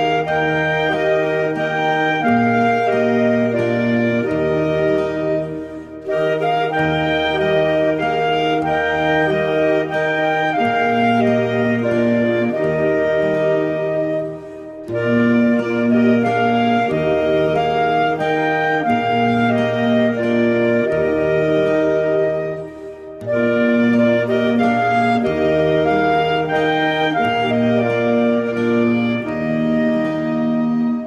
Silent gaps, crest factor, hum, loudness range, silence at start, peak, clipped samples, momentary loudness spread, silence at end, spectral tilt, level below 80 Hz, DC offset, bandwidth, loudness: none; 12 dB; none; 2 LU; 0 s; -6 dBFS; under 0.1%; 4 LU; 0 s; -7 dB/octave; -48 dBFS; under 0.1%; 8.2 kHz; -17 LUFS